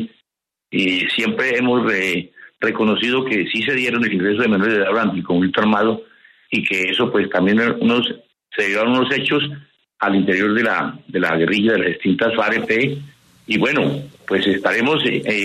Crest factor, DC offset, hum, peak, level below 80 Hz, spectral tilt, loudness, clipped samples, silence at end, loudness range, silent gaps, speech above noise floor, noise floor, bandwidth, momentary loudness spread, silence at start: 16 dB; under 0.1%; none; -2 dBFS; -60 dBFS; -5.5 dB/octave; -18 LUFS; under 0.1%; 0 s; 1 LU; none; 67 dB; -85 dBFS; 13 kHz; 7 LU; 0 s